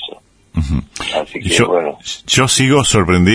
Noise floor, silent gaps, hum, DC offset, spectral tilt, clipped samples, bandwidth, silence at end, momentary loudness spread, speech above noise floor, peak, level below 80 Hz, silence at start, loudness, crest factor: -37 dBFS; none; none; under 0.1%; -4 dB/octave; under 0.1%; 11 kHz; 0 s; 12 LU; 24 dB; 0 dBFS; -32 dBFS; 0 s; -14 LUFS; 14 dB